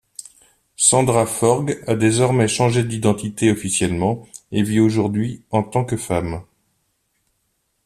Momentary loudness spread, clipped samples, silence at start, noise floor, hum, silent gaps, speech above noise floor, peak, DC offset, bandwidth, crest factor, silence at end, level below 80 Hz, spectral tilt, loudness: 8 LU; under 0.1%; 0.8 s; -69 dBFS; none; none; 51 dB; 0 dBFS; under 0.1%; 14.5 kHz; 20 dB; 1.45 s; -50 dBFS; -5 dB/octave; -19 LUFS